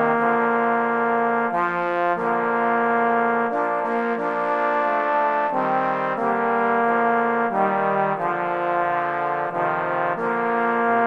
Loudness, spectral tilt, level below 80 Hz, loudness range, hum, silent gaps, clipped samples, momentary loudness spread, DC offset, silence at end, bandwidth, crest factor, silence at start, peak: -21 LUFS; -7.5 dB/octave; -72 dBFS; 1 LU; none; none; under 0.1%; 4 LU; under 0.1%; 0 s; 7.4 kHz; 14 dB; 0 s; -8 dBFS